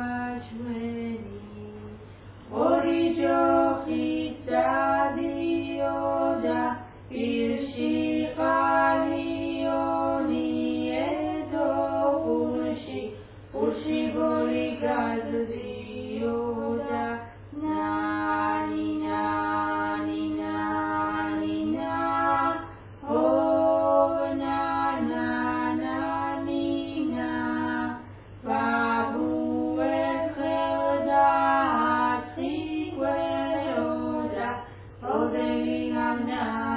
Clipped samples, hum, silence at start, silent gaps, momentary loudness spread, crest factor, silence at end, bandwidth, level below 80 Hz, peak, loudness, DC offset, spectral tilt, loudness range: under 0.1%; none; 0 s; none; 12 LU; 18 dB; 0 s; 4 kHz; -54 dBFS; -10 dBFS; -27 LUFS; under 0.1%; -10 dB/octave; 4 LU